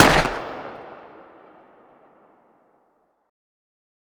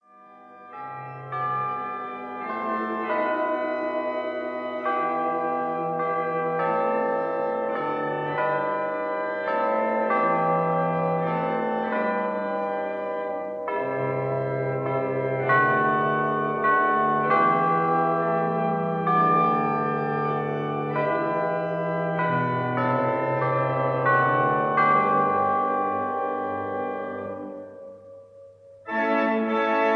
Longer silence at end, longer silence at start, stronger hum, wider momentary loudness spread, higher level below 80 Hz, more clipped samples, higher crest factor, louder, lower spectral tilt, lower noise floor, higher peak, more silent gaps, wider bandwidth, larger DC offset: first, 3.05 s vs 0 s; second, 0 s vs 0.2 s; neither; first, 28 LU vs 10 LU; first, -42 dBFS vs -76 dBFS; neither; first, 24 dB vs 16 dB; about the same, -22 LUFS vs -24 LUFS; second, -3.5 dB/octave vs -9 dB/octave; first, -66 dBFS vs -50 dBFS; first, 0 dBFS vs -8 dBFS; neither; first, over 20 kHz vs 6.4 kHz; neither